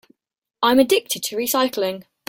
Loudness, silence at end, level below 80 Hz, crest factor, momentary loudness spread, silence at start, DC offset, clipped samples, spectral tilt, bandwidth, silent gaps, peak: -19 LUFS; 0.25 s; -60 dBFS; 18 dB; 9 LU; 0.6 s; under 0.1%; under 0.1%; -2.5 dB/octave; 17 kHz; none; -4 dBFS